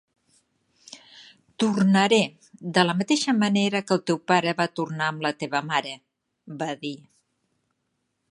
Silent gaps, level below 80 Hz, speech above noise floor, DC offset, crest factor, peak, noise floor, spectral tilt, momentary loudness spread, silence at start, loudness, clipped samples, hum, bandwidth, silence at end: none; -72 dBFS; 53 dB; under 0.1%; 22 dB; -4 dBFS; -76 dBFS; -5 dB/octave; 20 LU; 0.9 s; -23 LUFS; under 0.1%; none; 11 kHz; 1.35 s